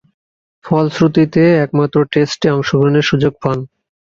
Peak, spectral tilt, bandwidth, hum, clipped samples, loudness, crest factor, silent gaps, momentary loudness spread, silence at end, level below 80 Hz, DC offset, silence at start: 0 dBFS; -7 dB/octave; 7.6 kHz; none; under 0.1%; -14 LUFS; 14 dB; none; 8 LU; 0.4 s; -48 dBFS; under 0.1%; 0.65 s